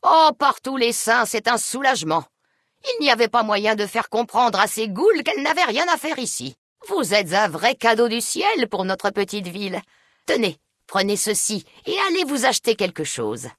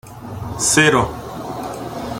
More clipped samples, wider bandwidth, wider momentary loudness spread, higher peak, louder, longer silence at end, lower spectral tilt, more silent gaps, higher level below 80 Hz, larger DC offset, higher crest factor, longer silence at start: neither; second, 12 kHz vs 17 kHz; second, 9 LU vs 17 LU; second, -4 dBFS vs 0 dBFS; second, -20 LUFS vs -17 LUFS; about the same, 0.05 s vs 0 s; about the same, -2.5 dB/octave vs -3 dB/octave; first, 6.58-6.76 s vs none; second, -68 dBFS vs -42 dBFS; neither; about the same, 18 dB vs 20 dB; about the same, 0.05 s vs 0.05 s